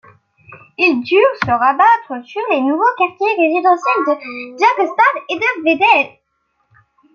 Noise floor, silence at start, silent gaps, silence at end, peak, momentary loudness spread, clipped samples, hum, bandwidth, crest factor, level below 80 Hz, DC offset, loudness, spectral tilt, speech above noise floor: -66 dBFS; 0.5 s; none; 1.05 s; -2 dBFS; 9 LU; under 0.1%; none; 7.2 kHz; 14 dB; -62 dBFS; under 0.1%; -14 LUFS; -5 dB/octave; 52 dB